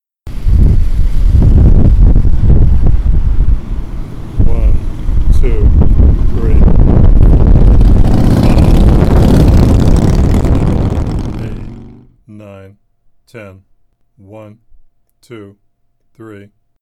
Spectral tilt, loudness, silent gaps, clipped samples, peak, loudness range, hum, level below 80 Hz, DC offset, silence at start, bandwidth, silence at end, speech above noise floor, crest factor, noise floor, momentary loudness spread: -8.5 dB/octave; -11 LUFS; none; under 0.1%; 0 dBFS; 9 LU; none; -10 dBFS; under 0.1%; 0.25 s; 8.8 kHz; 0.45 s; 23 dB; 8 dB; -55 dBFS; 13 LU